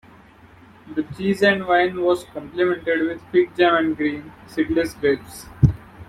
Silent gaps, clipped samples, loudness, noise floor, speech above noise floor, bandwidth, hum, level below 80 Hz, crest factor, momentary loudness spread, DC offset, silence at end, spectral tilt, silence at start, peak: none; under 0.1%; -21 LUFS; -48 dBFS; 28 dB; 14 kHz; none; -42 dBFS; 18 dB; 12 LU; under 0.1%; 0.05 s; -7 dB/octave; 0.85 s; -2 dBFS